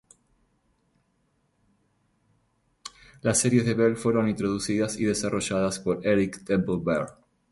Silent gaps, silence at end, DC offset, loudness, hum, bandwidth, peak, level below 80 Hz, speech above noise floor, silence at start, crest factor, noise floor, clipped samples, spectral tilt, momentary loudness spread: none; 0.4 s; under 0.1%; -25 LUFS; none; 12 kHz; -8 dBFS; -56 dBFS; 46 dB; 2.85 s; 20 dB; -70 dBFS; under 0.1%; -5 dB/octave; 12 LU